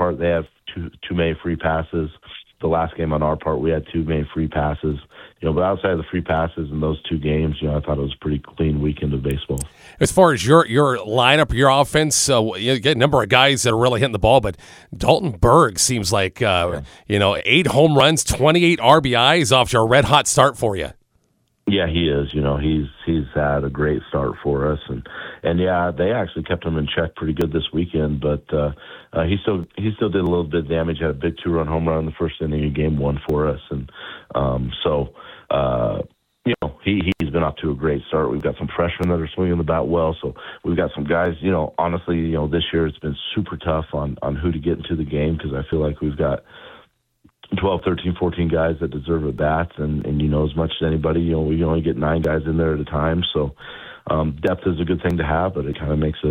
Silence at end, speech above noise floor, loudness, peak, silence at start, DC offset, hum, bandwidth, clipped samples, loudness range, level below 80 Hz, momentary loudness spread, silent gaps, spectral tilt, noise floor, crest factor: 0 s; 46 dB; -20 LUFS; 0 dBFS; 0 s; under 0.1%; none; 16 kHz; under 0.1%; 7 LU; -34 dBFS; 11 LU; none; -5 dB/octave; -65 dBFS; 20 dB